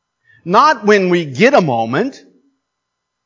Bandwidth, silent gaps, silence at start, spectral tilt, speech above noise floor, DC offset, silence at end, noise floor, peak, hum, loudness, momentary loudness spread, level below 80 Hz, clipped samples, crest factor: 7.6 kHz; none; 0.45 s; -5.5 dB/octave; 63 dB; under 0.1%; 1.1 s; -75 dBFS; 0 dBFS; none; -13 LUFS; 9 LU; -66 dBFS; under 0.1%; 14 dB